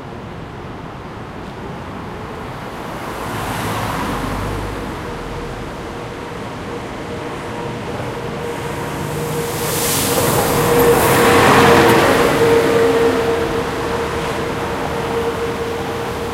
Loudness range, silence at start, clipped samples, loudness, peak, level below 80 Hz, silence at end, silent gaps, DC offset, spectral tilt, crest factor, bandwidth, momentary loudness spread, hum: 14 LU; 0 s; under 0.1%; -17 LUFS; 0 dBFS; -36 dBFS; 0 s; none; under 0.1%; -4.5 dB/octave; 18 dB; 16 kHz; 17 LU; none